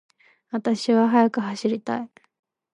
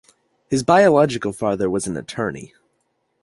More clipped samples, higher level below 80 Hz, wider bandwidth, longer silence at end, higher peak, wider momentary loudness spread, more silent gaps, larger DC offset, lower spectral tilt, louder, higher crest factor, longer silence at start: neither; second, -76 dBFS vs -52 dBFS; about the same, 10.5 kHz vs 11.5 kHz; about the same, 0.7 s vs 0.75 s; second, -6 dBFS vs -2 dBFS; about the same, 13 LU vs 13 LU; neither; neither; about the same, -6 dB/octave vs -5.5 dB/octave; second, -23 LUFS vs -19 LUFS; about the same, 18 dB vs 18 dB; about the same, 0.55 s vs 0.5 s